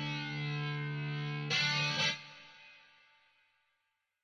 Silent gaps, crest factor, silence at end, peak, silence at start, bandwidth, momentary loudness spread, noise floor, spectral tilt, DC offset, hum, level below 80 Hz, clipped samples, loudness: none; 18 dB; 1.45 s; -20 dBFS; 0 s; 10 kHz; 22 LU; -83 dBFS; -4 dB/octave; under 0.1%; none; -78 dBFS; under 0.1%; -34 LUFS